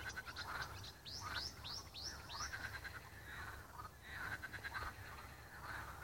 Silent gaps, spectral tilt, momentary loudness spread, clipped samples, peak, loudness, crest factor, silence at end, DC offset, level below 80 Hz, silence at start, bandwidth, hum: none; -2.5 dB/octave; 8 LU; under 0.1%; -30 dBFS; -48 LUFS; 20 dB; 0 s; under 0.1%; -60 dBFS; 0 s; 16.5 kHz; none